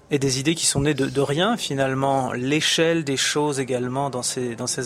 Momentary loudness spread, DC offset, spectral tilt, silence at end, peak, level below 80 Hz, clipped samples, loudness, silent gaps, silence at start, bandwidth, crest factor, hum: 5 LU; under 0.1%; -3.5 dB/octave; 0 s; -6 dBFS; -52 dBFS; under 0.1%; -22 LUFS; none; 0.1 s; 15.5 kHz; 16 dB; none